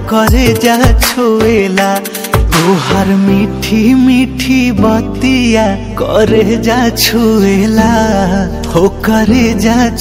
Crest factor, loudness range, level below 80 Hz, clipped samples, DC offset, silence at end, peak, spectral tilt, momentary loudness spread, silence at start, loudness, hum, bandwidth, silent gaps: 10 dB; 0 LU; -20 dBFS; 0.6%; under 0.1%; 0 s; 0 dBFS; -5.5 dB/octave; 4 LU; 0 s; -10 LUFS; none; 16.5 kHz; none